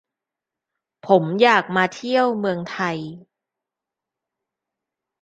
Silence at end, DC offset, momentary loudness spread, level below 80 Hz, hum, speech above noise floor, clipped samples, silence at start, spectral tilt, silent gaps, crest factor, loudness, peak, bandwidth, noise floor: 2.05 s; under 0.1%; 14 LU; -70 dBFS; none; 67 dB; under 0.1%; 1.05 s; -5.5 dB/octave; none; 22 dB; -19 LUFS; -2 dBFS; 9.2 kHz; -87 dBFS